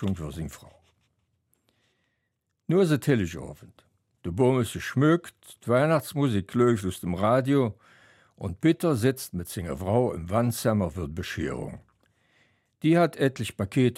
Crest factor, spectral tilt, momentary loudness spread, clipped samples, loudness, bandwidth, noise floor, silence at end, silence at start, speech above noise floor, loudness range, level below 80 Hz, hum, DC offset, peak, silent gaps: 18 dB; -6.5 dB/octave; 14 LU; under 0.1%; -26 LUFS; 16 kHz; -78 dBFS; 0 s; 0 s; 53 dB; 5 LU; -52 dBFS; none; under 0.1%; -8 dBFS; none